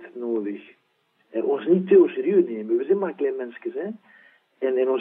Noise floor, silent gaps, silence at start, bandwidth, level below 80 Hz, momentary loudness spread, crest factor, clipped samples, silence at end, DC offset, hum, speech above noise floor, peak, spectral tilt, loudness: -67 dBFS; none; 0 s; 3.8 kHz; -90 dBFS; 16 LU; 18 dB; under 0.1%; 0 s; under 0.1%; none; 45 dB; -6 dBFS; -11 dB/octave; -23 LUFS